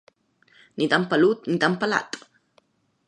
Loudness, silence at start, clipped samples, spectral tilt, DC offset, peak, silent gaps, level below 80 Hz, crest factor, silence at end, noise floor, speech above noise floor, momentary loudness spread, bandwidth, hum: -22 LUFS; 0.75 s; under 0.1%; -5.5 dB/octave; under 0.1%; -4 dBFS; none; -72 dBFS; 22 dB; 0.9 s; -64 dBFS; 42 dB; 17 LU; 10.5 kHz; none